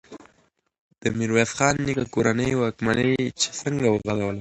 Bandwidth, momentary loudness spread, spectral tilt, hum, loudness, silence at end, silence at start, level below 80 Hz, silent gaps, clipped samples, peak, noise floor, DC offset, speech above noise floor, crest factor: 11 kHz; 5 LU; -4.5 dB/octave; none; -23 LUFS; 0 s; 0.1 s; -50 dBFS; 0.80-0.91 s; under 0.1%; -4 dBFS; -64 dBFS; under 0.1%; 41 dB; 20 dB